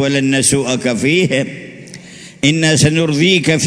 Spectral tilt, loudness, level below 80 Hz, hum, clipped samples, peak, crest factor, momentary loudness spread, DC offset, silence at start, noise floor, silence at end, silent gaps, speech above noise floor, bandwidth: -4 dB/octave; -13 LUFS; -46 dBFS; none; under 0.1%; 0 dBFS; 14 dB; 21 LU; under 0.1%; 0 s; -35 dBFS; 0 s; none; 22 dB; 11 kHz